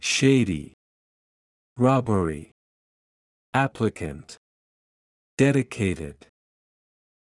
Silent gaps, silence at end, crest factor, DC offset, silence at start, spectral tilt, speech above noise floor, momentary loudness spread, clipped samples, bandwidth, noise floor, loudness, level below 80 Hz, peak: 0.74-1.76 s, 2.52-3.53 s, 4.37-5.37 s; 1.2 s; 20 dB; under 0.1%; 0 s; -5.5 dB/octave; over 67 dB; 19 LU; under 0.1%; 12 kHz; under -90 dBFS; -23 LUFS; -54 dBFS; -6 dBFS